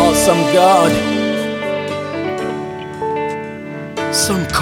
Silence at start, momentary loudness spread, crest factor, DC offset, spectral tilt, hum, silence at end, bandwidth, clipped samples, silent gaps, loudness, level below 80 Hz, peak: 0 s; 15 LU; 16 dB; under 0.1%; -4 dB/octave; none; 0 s; 17.5 kHz; under 0.1%; none; -16 LUFS; -42 dBFS; 0 dBFS